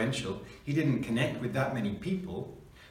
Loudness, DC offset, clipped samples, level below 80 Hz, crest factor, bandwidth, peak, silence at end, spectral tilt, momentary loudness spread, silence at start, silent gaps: -32 LUFS; under 0.1%; under 0.1%; -56 dBFS; 16 dB; 15.5 kHz; -16 dBFS; 0 s; -6.5 dB/octave; 11 LU; 0 s; none